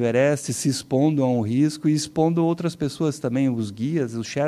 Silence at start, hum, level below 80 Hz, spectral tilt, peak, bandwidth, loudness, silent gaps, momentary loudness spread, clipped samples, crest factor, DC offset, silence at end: 0 s; none; -58 dBFS; -6 dB/octave; -8 dBFS; 14 kHz; -23 LUFS; none; 5 LU; under 0.1%; 14 dB; under 0.1%; 0 s